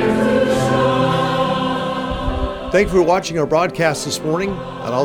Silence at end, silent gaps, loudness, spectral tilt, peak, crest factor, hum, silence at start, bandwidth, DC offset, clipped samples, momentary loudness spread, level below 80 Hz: 0 s; none; -18 LUFS; -5.5 dB/octave; -2 dBFS; 16 dB; none; 0 s; 17.5 kHz; under 0.1%; under 0.1%; 7 LU; -34 dBFS